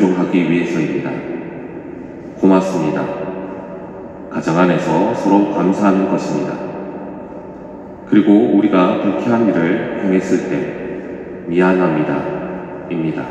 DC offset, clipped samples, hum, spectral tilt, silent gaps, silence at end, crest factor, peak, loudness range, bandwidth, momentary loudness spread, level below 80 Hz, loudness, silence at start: under 0.1%; under 0.1%; none; -7.5 dB/octave; none; 0 s; 16 dB; 0 dBFS; 4 LU; 8.4 kHz; 17 LU; -52 dBFS; -16 LUFS; 0 s